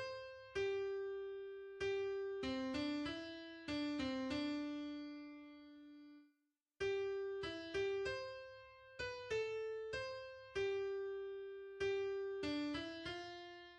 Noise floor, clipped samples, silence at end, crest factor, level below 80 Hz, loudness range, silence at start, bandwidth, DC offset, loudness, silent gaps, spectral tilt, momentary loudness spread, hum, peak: -86 dBFS; under 0.1%; 0 s; 14 dB; -70 dBFS; 3 LU; 0 s; 9.4 kHz; under 0.1%; -44 LUFS; none; -5 dB/octave; 13 LU; none; -30 dBFS